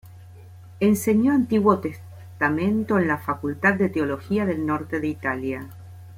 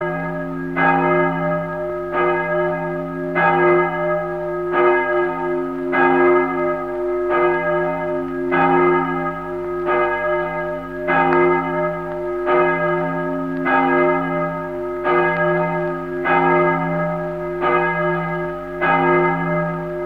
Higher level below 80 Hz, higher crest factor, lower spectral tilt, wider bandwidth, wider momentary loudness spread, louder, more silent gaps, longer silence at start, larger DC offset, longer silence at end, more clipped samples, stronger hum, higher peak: second, -58 dBFS vs -46 dBFS; about the same, 18 dB vs 18 dB; second, -7 dB/octave vs -8.5 dB/octave; first, 16 kHz vs 4.8 kHz; first, 13 LU vs 9 LU; second, -23 LUFS vs -19 LUFS; neither; about the same, 0.05 s vs 0 s; second, under 0.1% vs 0.3%; about the same, 0 s vs 0 s; neither; neither; second, -6 dBFS vs 0 dBFS